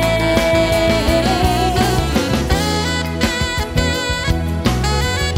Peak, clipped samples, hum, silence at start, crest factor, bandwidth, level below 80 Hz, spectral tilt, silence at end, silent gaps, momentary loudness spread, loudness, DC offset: -2 dBFS; under 0.1%; none; 0 s; 14 dB; 16.5 kHz; -24 dBFS; -5 dB/octave; 0 s; none; 4 LU; -16 LUFS; under 0.1%